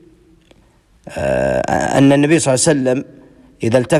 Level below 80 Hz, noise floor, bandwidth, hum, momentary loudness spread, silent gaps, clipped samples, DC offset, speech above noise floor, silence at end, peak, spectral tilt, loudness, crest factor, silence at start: -42 dBFS; -52 dBFS; 12.5 kHz; none; 11 LU; none; under 0.1%; under 0.1%; 38 dB; 0 s; -2 dBFS; -5 dB/octave; -15 LUFS; 14 dB; 1.05 s